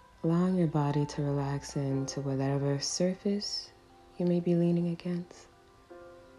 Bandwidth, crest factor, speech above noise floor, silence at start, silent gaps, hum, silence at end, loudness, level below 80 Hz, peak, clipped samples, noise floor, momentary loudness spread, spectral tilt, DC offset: 11.5 kHz; 14 dB; 24 dB; 0.25 s; none; none; 0.15 s; -31 LUFS; -60 dBFS; -18 dBFS; under 0.1%; -54 dBFS; 10 LU; -6 dB/octave; under 0.1%